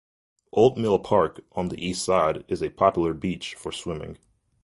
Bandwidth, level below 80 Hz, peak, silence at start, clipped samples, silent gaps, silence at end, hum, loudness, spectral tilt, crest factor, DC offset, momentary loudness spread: 11.5 kHz; -50 dBFS; -4 dBFS; 0.55 s; under 0.1%; none; 0.5 s; none; -25 LUFS; -5.5 dB/octave; 22 dB; under 0.1%; 12 LU